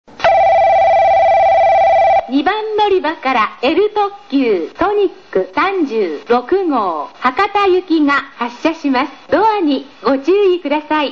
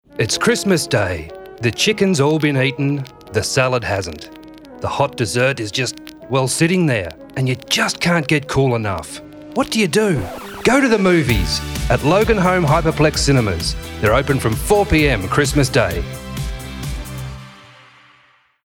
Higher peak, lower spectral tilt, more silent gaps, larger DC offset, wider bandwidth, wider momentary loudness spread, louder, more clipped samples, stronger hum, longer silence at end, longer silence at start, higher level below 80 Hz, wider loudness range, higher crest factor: about the same, -2 dBFS vs -4 dBFS; about the same, -5.5 dB/octave vs -5 dB/octave; neither; first, 0.4% vs under 0.1%; second, 7 kHz vs over 20 kHz; second, 7 LU vs 13 LU; first, -14 LUFS vs -17 LUFS; neither; neither; second, 0 s vs 1.1 s; about the same, 0.2 s vs 0.15 s; second, -48 dBFS vs -32 dBFS; about the same, 4 LU vs 4 LU; about the same, 12 dB vs 14 dB